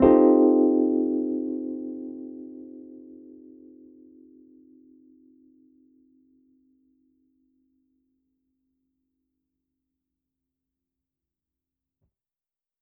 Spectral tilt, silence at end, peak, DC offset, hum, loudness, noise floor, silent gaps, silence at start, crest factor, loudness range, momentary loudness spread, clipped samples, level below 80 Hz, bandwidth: -6 dB/octave; 9.85 s; -4 dBFS; under 0.1%; none; -22 LUFS; under -90 dBFS; none; 0 s; 24 dB; 28 LU; 28 LU; under 0.1%; -56 dBFS; 3.3 kHz